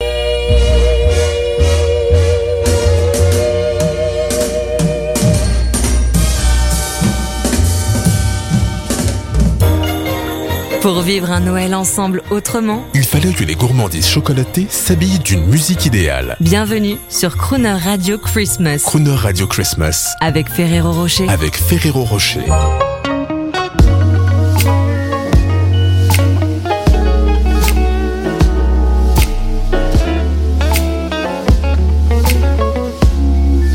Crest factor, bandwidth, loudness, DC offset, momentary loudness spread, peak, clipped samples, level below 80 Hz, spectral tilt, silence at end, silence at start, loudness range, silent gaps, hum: 12 dB; 17 kHz; -14 LUFS; under 0.1%; 5 LU; 0 dBFS; under 0.1%; -16 dBFS; -5 dB/octave; 0 s; 0 s; 2 LU; none; none